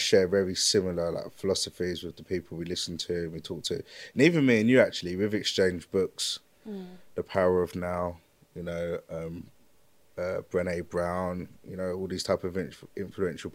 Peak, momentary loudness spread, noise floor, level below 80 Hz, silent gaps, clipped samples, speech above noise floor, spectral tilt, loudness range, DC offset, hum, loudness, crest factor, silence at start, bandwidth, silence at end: -6 dBFS; 16 LU; -66 dBFS; -64 dBFS; none; under 0.1%; 37 dB; -4.5 dB/octave; 8 LU; under 0.1%; none; -29 LUFS; 22 dB; 0 s; 16 kHz; 0 s